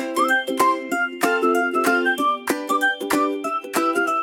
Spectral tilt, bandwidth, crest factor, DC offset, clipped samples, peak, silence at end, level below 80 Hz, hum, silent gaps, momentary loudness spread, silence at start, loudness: -2.5 dB/octave; 17 kHz; 16 dB; under 0.1%; under 0.1%; -4 dBFS; 0 s; -68 dBFS; none; none; 4 LU; 0 s; -20 LUFS